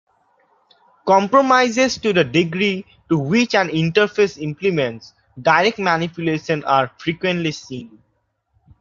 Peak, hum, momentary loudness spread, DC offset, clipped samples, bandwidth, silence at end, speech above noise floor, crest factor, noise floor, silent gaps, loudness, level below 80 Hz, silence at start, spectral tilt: -2 dBFS; none; 11 LU; under 0.1%; under 0.1%; 7.6 kHz; 0.95 s; 50 dB; 18 dB; -68 dBFS; none; -18 LUFS; -56 dBFS; 1.05 s; -5 dB/octave